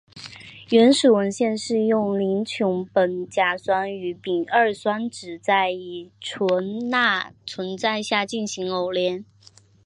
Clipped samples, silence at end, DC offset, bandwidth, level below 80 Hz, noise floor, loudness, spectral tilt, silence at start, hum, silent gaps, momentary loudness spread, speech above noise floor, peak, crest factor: under 0.1%; 0.65 s; under 0.1%; 11 kHz; -66 dBFS; -42 dBFS; -22 LUFS; -4.5 dB/octave; 0.15 s; none; none; 14 LU; 19 dB; -4 dBFS; 18 dB